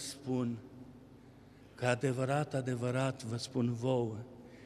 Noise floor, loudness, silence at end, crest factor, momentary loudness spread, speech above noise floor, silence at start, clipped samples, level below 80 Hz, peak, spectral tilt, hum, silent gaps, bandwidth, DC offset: -57 dBFS; -35 LUFS; 0 s; 20 dB; 19 LU; 23 dB; 0 s; under 0.1%; -68 dBFS; -16 dBFS; -6 dB/octave; none; none; 13 kHz; under 0.1%